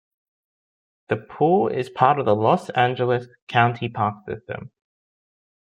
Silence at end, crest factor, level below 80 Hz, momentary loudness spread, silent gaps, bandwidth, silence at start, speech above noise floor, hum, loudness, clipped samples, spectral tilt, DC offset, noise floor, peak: 1.05 s; 22 dB; -64 dBFS; 13 LU; 3.42-3.47 s; 11 kHz; 1.1 s; over 69 dB; none; -21 LUFS; under 0.1%; -7.5 dB/octave; under 0.1%; under -90 dBFS; -2 dBFS